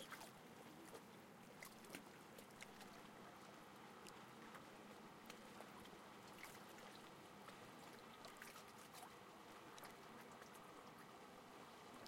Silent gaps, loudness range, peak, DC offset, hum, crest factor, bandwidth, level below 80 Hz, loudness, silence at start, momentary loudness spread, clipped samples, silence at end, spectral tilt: none; 1 LU; -36 dBFS; under 0.1%; none; 24 dB; 16.5 kHz; -86 dBFS; -60 LUFS; 0 s; 3 LU; under 0.1%; 0 s; -3.5 dB/octave